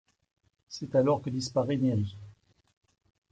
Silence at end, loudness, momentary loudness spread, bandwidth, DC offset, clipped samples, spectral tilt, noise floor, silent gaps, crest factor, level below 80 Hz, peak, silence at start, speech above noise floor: 1 s; -29 LUFS; 16 LU; 9.2 kHz; under 0.1%; under 0.1%; -7 dB/octave; -55 dBFS; none; 18 dB; -70 dBFS; -14 dBFS; 0.7 s; 27 dB